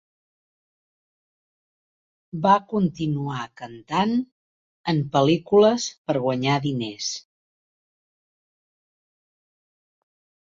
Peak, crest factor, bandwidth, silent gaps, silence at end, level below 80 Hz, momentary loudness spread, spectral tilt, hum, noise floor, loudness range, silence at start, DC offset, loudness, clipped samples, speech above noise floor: -6 dBFS; 20 dB; 7.8 kHz; 4.32-4.84 s, 5.98-6.05 s; 3.25 s; -62 dBFS; 15 LU; -5.5 dB/octave; none; under -90 dBFS; 8 LU; 2.35 s; under 0.1%; -23 LUFS; under 0.1%; over 68 dB